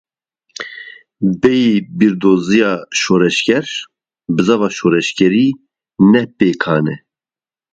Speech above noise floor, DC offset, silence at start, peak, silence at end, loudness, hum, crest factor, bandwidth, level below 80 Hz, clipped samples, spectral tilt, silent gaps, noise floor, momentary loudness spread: over 77 dB; under 0.1%; 0.6 s; 0 dBFS; 0.75 s; -14 LUFS; none; 14 dB; 9 kHz; -52 dBFS; under 0.1%; -5.5 dB/octave; none; under -90 dBFS; 17 LU